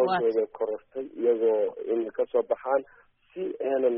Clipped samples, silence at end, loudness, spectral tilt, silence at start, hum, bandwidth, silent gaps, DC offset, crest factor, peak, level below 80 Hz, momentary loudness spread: under 0.1%; 0 s; -28 LUFS; -1.5 dB/octave; 0 s; none; 3.8 kHz; none; under 0.1%; 14 dB; -12 dBFS; -72 dBFS; 11 LU